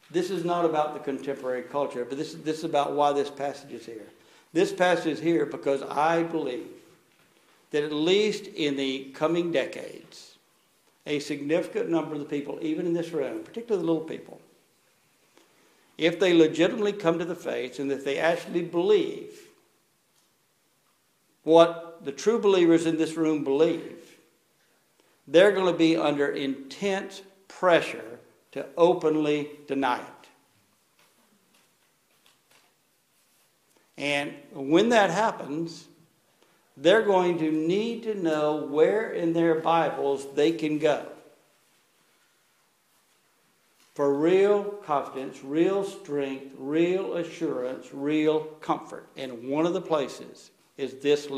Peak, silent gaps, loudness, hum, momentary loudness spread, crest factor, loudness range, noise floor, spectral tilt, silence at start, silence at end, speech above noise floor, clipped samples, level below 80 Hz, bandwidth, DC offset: -4 dBFS; none; -26 LUFS; none; 16 LU; 24 dB; 6 LU; -68 dBFS; -5.5 dB/octave; 0.1 s; 0 s; 43 dB; under 0.1%; -76 dBFS; 13 kHz; under 0.1%